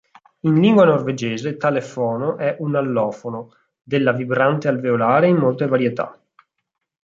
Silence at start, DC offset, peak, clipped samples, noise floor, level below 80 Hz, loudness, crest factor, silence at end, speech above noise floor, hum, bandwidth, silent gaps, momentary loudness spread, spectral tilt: 0.45 s; under 0.1%; -2 dBFS; under 0.1%; -78 dBFS; -64 dBFS; -18 LUFS; 16 dB; 0.9 s; 60 dB; none; 7.6 kHz; none; 10 LU; -7.5 dB/octave